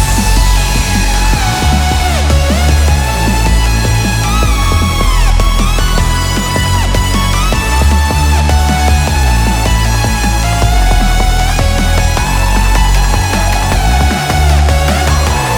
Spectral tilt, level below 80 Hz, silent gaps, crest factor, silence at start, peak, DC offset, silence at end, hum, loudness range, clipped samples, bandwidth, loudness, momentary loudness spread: -4.5 dB/octave; -12 dBFS; none; 10 dB; 0 s; 0 dBFS; under 0.1%; 0 s; none; 1 LU; under 0.1%; over 20 kHz; -11 LUFS; 2 LU